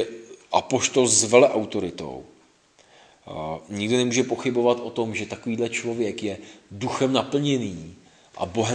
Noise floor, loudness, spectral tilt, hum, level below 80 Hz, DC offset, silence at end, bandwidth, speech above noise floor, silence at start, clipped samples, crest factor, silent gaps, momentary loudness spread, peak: -58 dBFS; -23 LUFS; -3.5 dB/octave; none; -62 dBFS; under 0.1%; 0 s; 10.5 kHz; 34 dB; 0 s; under 0.1%; 24 dB; none; 19 LU; 0 dBFS